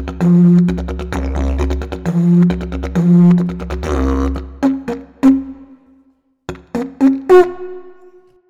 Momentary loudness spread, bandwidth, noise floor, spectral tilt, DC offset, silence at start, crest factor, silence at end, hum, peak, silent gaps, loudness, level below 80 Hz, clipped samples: 16 LU; 7.4 kHz; -55 dBFS; -9 dB/octave; under 0.1%; 0 s; 14 dB; 0.55 s; none; -2 dBFS; none; -14 LUFS; -26 dBFS; under 0.1%